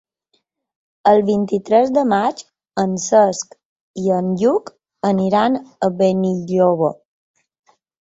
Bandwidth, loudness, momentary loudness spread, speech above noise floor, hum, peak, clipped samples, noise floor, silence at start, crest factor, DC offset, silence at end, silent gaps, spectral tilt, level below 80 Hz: 8 kHz; -17 LUFS; 9 LU; 52 dB; none; -2 dBFS; under 0.1%; -68 dBFS; 1.05 s; 16 dB; under 0.1%; 1.1 s; 3.65-3.94 s; -6 dB/octave; -60 dBFS